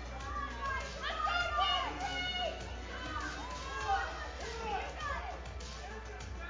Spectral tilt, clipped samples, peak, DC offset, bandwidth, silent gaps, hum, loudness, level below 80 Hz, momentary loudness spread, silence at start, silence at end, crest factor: -3.5 dB/octave; under 0.1%; -22 dBFS; under 0.1%; 7.6 kHz; none; none; -37 LUFS; -46 dBFS; 12 LU; 0 s; 0 s; 16 dB